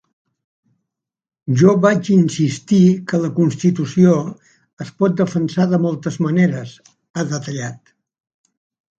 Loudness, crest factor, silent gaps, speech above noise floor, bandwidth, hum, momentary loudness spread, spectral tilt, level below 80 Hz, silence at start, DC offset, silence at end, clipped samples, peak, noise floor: -16 LUFS; 18 dB; 4.73-4.77 s, 7.10-7.14 s; 71 dB; 7.8 kHz; none; 16 LU; -7 dB/octave; -58 dBFS; 1.45 s; under 0.1%; 1.25 s; under 0.1%; 0 dBFS; -87 dBFS